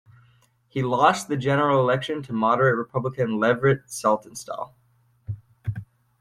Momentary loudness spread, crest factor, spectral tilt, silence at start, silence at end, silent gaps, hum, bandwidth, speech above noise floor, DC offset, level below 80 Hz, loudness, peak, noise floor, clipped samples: 15 LU; 20 dB; -6 dB/octave; 0.75 s; 0.4 s; none; none; 15 kHz; 38 dB; under 0.1%; -58 dBFS; -23 LUFS; -4 dBFS; -60 dBFS; under 0.1%